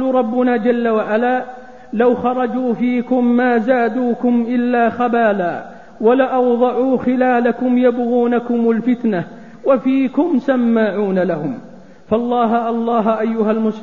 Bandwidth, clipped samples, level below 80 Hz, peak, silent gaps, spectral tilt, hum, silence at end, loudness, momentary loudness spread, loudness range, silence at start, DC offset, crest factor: 4.3 kHz; under 0.1%; -56 dBFS; -2 dBFS; none; -8.5 dB/octave; none; 0 s; -16 LUFS; 6 LU; 2 LU; 0 s; 0.6%; 14 dB